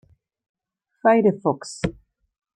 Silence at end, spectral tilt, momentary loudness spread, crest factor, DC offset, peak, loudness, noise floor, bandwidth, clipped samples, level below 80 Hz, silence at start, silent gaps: 0.65 s; -6.5 dB/octave; 12 LU; 18 dB; under 0.1%; -6 dBFS; -21 LUFS; -49 dBFS; 11 kHz; under 0.1%; -52 dBFS; 1.05 s; none